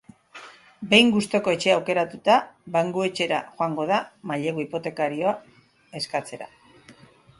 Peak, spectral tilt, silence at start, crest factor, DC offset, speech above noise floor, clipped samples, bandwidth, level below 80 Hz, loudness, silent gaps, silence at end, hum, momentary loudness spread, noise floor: 0 dBFS; -4.5 dB/octave; 0.35 s; 24 dB; under 0.1%; 29 dB; under 0.1%; 11.5 kHz; -66 dBFS; -23 LUFS; none; 0.5 s; none; 21 LU; -52 dBFS